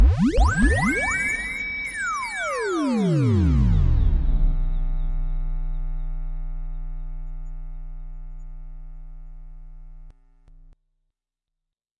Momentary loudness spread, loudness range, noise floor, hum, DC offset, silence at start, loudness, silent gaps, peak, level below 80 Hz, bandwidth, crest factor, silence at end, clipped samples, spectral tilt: 23 LU; 21 LU; -85 dBFS; none; under 0.1%; 0 s; -23 LUFS; none; -6 dBFS; -26 dBFS; 11.5 kHz; 16 dB; 1.9 s; under 0.1%; -6.5 dB/octave